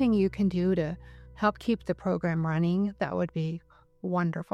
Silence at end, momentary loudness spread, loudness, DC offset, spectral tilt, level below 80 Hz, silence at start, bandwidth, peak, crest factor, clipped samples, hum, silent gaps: 0.1 s; 9 LU; -29 LUFS; under 0.1%; -8.5 dB/octave; -52 dBFS; 0 s; 8.2 kHz; -12 dBFS; 16 dB; under 0.1%; none; none